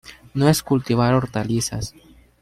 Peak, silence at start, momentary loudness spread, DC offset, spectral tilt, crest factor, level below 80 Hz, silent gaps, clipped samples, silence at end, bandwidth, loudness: -4 dBFS; 0.05 s; 13 LU; under 0.1%; -5.5 dB/octave; 18 dB; -46 dBFS; none; under 0.1%; 0.55 s; 16 kHz; -21 LUFS